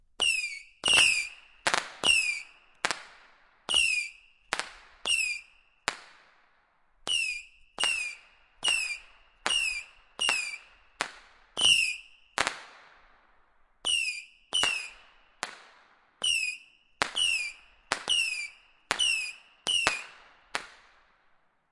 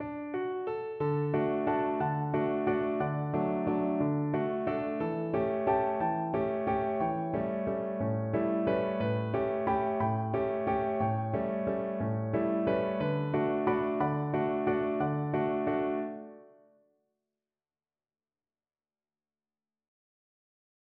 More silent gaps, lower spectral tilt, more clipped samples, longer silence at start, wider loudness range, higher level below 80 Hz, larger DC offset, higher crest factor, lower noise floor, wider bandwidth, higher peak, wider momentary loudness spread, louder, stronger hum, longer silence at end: neither; second, 1.5 dB/octave vs -7.5 dB/octave; neither; first, 0.2 s vs 0 s; first, 6 LU vs 3 LU; about the same, -64 dBFS vs -60 dBFS; neither; first, 30 dB vs 16 dB; second, -67 dBFS vs under -90 dBFS; first, 11.5 kHz vs 4.8 kHz; first, -2 dBFS vs -16 dBFS; first, 17 LU vs 4 LU; first, -28 LUFS vs -31 LUFS; neither; second, 1 s vs 4.5 s